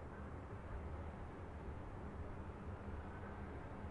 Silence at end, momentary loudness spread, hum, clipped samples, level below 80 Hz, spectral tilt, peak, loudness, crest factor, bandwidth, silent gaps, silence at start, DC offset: 0 s; 2 LU; none; under 0.1%; -54 dBFS; -8.5 dB/octave; -36 dBFS; -51 LUFS; 12 dB; 11 kHz; none; 0 s; under 0.1%